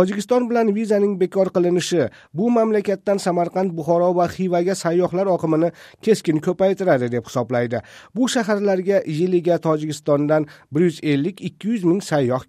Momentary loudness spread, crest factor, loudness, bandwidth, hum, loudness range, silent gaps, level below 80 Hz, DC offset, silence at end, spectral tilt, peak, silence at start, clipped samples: 5 LU; 16 dB; -20 LUFS; 14.5 kHz; none; 1 LU; none; -62 dBFS; under 0.1%; 0.05 s; -6.5 dB/octave; -4 dBFS; 0 s; under 0.1%